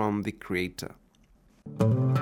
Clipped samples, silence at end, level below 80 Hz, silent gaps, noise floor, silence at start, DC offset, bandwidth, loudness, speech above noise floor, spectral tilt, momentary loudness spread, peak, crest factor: under 0.1%; 0 s; -60 dBFS; none; -61 dBFS; 0 s; under 0.1%; 16.5 kHz; -29 LUFS; 33 dB; -7.5 dB/octave; 20 LU; -12 dBFS; 18 dB